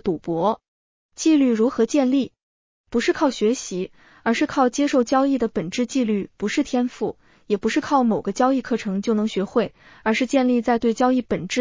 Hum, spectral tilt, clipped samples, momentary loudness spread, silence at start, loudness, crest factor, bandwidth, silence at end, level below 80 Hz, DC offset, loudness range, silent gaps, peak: none; -5 dB/octave; under 0.1%; 8 LU; 0.05 s; -22 LUFS; 16 dB; 7.6 kHz; 0 s; -56 dBFS; under 0.1%; 1 LU; 0.68-1.09 s, 2.43-2.84 s; -6 dBFS